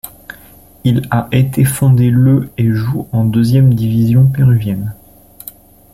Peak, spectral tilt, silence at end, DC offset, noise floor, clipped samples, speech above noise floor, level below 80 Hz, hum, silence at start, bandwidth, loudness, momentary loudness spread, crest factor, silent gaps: -2 dBFS; -7.5 dB/octave; 1 s; under 0.1%; -41 dBFS; under 0.1%; 30 dB; -40 dBFS; none; 0.05 s; 16 kHz; -12 LUFS; 22 LU; 10 dB; none